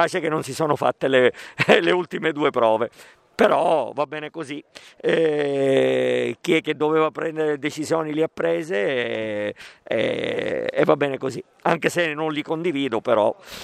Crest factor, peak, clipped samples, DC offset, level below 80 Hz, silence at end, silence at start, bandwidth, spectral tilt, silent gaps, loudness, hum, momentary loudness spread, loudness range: 22 dB; 0 dBFS; under 0.1%; under 0.1%; -66 dBFS; 0 s; 0 s; 14.5 kHz; -5 dB/octave; none; -22 LUFS; none; 9 LU; 4 LU